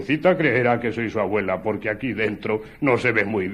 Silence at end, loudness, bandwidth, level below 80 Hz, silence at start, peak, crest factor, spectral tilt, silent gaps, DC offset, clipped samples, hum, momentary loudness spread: 0 s; -22 LUFS; 12 kHz; -52 dBFS; 0 s; -4 dBFS; 18 dB; -7.5 dB/octave; none; under 0.1%; under 0.1%; none; 7 LU